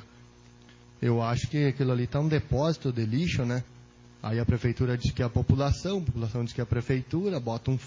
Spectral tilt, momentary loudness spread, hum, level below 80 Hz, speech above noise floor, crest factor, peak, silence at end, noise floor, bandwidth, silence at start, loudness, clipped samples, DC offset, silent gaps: -7.5 dB/octave; 5 LU; 60 Hz at -45 dBFS; -42 dBFS; 26 dB; 20 dB; -8 dBFS; 0 s; -53 dBFS; 7.6 kHz; 0 s; -28 LUFS; under 0.1%; under 0.1%; none